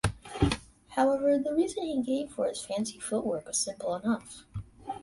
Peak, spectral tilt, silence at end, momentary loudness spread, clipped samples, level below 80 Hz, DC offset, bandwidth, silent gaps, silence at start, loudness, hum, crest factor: -12 dBFS; -5 dB/octave; 0 s; 12 LU; under 0.1%; -48 dBFS; under 0.1%; 11.5 kHz; none; 0.05 s; -30 LUFS; none; 18 dB